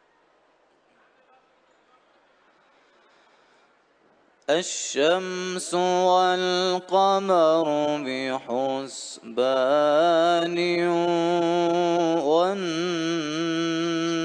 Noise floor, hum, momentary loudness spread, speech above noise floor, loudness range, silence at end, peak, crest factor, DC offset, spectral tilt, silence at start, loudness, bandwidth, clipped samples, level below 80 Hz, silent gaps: -62 dBFS; none; 8 LU; 40 dB; 7 LU; 0 s; -8 dBFS; 16 dB; under 0.1%; -4 dB/octave; 4.5 s; -23 LUFS; 10 kHz; under 0.1%; -78 dBFS; none